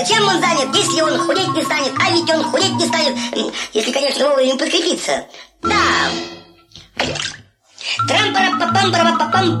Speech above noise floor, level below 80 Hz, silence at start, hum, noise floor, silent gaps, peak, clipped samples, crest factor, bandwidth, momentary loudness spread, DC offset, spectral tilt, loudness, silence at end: 27 dB; -52 dBFS; 0 s; none; -43 dBFS; none; -4 dBFS; under 0.1%; 14 dB; 15 kHz; 9 LU; under 0.1%; -3 dB/octave; -16 LUFS; 0 s